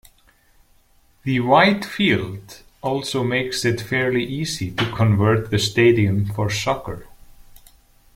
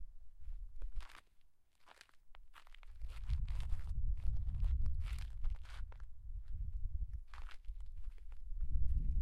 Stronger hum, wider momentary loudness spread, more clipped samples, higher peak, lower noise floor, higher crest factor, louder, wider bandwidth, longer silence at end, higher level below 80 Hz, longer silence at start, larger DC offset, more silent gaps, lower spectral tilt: neither; second, 12 LU vs 21 LU; neither; first, -2 dBFS vs -22 dBFS; second, -56 dBFS vs -64 dBFS; about the same, 18 dB vs 16 dB; first, -20 LUFS vs -46 LUFS; first, 16 kHz vs 5.4 kHz; first, 0.6 s vs 0 s; second, -48 dBFS vs -42 dBFS; first, 1.25 s vs 0 s; neither; neither; about the same, -5.5 dB/octave vs -6.5 dB/octave